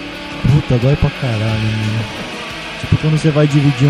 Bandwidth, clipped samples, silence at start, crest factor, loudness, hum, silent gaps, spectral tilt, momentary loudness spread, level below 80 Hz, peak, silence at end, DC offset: 11.5 kHz; under 0.1%; 0 s; 14 dB; -16 LUFS; none; none; -7 dB/octave; 11 LU; -32 dBFS; 0 dBFS; 0 s; under 0.1%